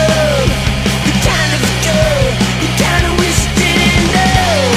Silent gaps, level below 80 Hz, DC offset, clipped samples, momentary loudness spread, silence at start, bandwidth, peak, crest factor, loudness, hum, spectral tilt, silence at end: none; -22 dBFS; under 0.1%; under 0.1%; 3 LU; 0 s; 16 kHz; 0 dBFS; 12 dB; -12 LUFS; none; -4 dB/octave; 0 s